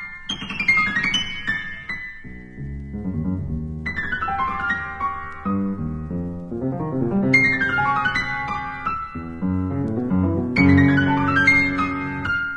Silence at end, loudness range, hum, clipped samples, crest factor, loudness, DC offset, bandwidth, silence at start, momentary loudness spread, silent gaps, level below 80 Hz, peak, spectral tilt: 0 s; 8 LU; none; under 0.1%; 18 dB; -21 LUFS; under 0.1%; 9.6 kHz; 0 s; 14 LU; none; -42 dBFS; -2 dBFS; -6 dB/octave